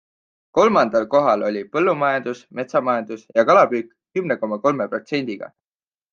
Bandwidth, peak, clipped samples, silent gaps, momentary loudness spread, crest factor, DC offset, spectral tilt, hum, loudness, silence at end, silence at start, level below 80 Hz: 7.2 kHz; -2 dBFS; under 0.1%; none; 13 LU; 18 dB; under 0.1%; -6 dB/octave; none; -20 LUFS; 0.65 s; 0.55 s; -66 dBFS